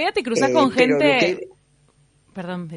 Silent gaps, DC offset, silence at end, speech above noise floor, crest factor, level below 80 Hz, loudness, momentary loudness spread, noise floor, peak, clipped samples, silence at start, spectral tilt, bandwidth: none; under 0.1%; 0 s; 40 dB; 18 dB; -62 dBFS; -18 LUFS; 16 LU; -59 dBFS; -2 dBFS; under 0.1%; 0 s; -4.5 dB/octave; 11 kHz